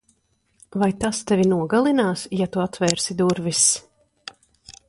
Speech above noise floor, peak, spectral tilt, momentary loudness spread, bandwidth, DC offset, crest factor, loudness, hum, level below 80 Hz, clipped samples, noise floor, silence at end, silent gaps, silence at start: 46 dB; -2 dBFS; -4 dB/octave; 17 LU; 11.5 kHz; under 0.1%; 20 dB; -21 LUFS; none; -54 dBFS; under 0.1%; -66 dBFS; 0.2 s; none; 0.75 s